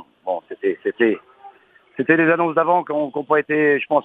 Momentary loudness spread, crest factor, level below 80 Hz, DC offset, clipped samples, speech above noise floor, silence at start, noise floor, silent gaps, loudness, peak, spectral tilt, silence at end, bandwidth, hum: 11 LU; 18 dB; -70 dBFS; under 0.1%; under 0.1%; 32 dB; 0.25 s; -50 dBFS; none; -19 LUFS; -2 dBFS; -8.5 dB/octave; 0 s; 4.4 kHz; none